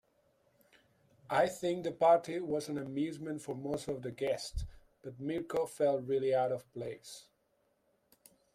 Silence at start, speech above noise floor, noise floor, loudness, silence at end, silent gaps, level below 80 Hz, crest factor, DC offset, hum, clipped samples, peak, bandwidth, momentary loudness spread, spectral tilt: 1.3 s; 42 dB; -76 dBFS; -35 LUFS; 1.35 s; none; -56 dBFS; 20 dB; under 0.1%; none; under 0.1%; -16 dBFS; 15.5 kHz; 15 LU; -5.5 dB/octave